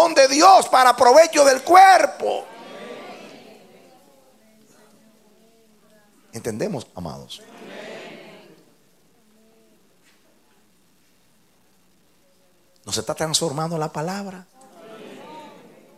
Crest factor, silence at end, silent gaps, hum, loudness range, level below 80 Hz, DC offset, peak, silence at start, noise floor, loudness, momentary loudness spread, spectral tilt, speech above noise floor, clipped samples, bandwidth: 20 dB; 0.6 s; none; none; 26 LU; -66 dBFS; under 0.1%; -2 dBFS; 0 s; -61 dBFS; -16 LUFS; 28 LU; -3 dB/octave; 44 dB; under 0.1%; 15 kHz